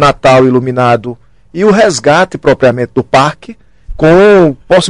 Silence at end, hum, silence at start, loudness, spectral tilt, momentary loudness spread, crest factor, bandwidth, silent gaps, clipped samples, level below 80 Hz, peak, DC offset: 0 s; none; 0 s; -8 LUFS; -5.5 dB/octave; 8 LU; 8 dB; 11.5 kHz; none; under 0.1%; -32 dBFS; 0 dBFS; 0.7%